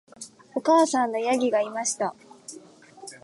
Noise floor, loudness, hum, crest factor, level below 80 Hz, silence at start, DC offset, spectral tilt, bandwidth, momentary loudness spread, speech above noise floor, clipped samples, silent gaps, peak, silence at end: -48 dBFS; -24 LUFS; none; 16 dB; -82 dBFS; 0.2 s; under 0.1%; -3 dB/octave; 11.5 kHz; 23 LU; 25 dB; under 0.1%; none; -10 dBFS; 0.05 s